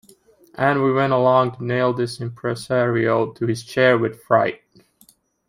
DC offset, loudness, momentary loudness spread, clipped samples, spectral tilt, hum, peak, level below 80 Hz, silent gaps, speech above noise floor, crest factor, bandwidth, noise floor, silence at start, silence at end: under 0.1%; -20 LUFS; 9 LU; under 0.1%; -6.5 dB/octave; none; -2 dBFS; -62 dBFS; none; 37 dB; 18 dB; 15.5 kHz; -56 dBFS; 0.6 s; 0.95 s